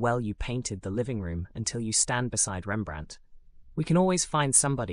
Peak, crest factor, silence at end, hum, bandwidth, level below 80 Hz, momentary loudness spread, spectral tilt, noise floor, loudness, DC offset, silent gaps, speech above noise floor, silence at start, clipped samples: -8 dBFS; 20 dB; 0 s; none; 13 kHz; -46 dBFS; 13 LU; -4 dB/octave; -49 dBFS; -27 LUFS; under 0.1%; none; 21 dB; 0 s; under 0.1%